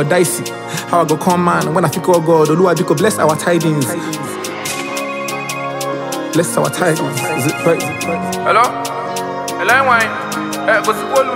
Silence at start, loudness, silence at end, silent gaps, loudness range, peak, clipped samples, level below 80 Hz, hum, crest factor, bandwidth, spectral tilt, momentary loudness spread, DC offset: 0 s; -15 LUFS; 0 s; none; 5 LU; 0 dBFS; under 0.1%; -60 dBFS; none; 14 dB; 16.5 kHz; -4.5 dB/octave; 9 LU; under 0.1%